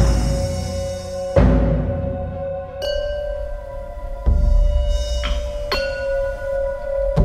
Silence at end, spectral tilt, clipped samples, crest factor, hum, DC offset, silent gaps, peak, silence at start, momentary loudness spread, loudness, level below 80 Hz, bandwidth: 0 s; -6.5 dB/octave; under 0.1%; 18 dB; none; under 0.1%; none; -2 dBFS; 0 s; 10 LU; -22 LUFS; -22 dBFS; 13 kHz